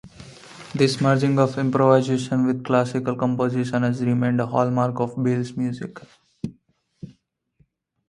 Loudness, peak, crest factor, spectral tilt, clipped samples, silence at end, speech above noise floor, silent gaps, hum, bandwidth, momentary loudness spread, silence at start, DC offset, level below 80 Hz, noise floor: -21 LUFS; -2 dBFS; 20 dB; -7 dB/octave; under 0.1%; 1 s; 43 dB; none; none; 11.5 kHz; 17 LU; 0.05 s; under 0.1%; -60 dBFS; -64 dBFS